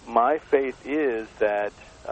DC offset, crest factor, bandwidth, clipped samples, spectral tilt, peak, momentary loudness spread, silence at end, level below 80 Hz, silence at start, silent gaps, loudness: under 0.1%; 20 dB; 8.6 kHz; under 0.1%; -5.5 dB/octave; -4 dBFS; 8 LU; 0 s; -56 dBFS; 0.05 s; none; -25 LUFS